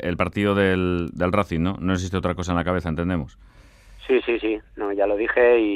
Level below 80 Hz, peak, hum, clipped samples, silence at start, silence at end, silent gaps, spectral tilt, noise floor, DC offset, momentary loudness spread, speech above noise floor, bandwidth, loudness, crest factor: -46 dBFS; -4 dBFS; none; under 0.1%; 0 s; 0 s; none; -7 dB/octave; -46 dBFS; under 0.1%; 9 LU; 24 dB; 12.5 kHz; -22 LUFS; 18 dB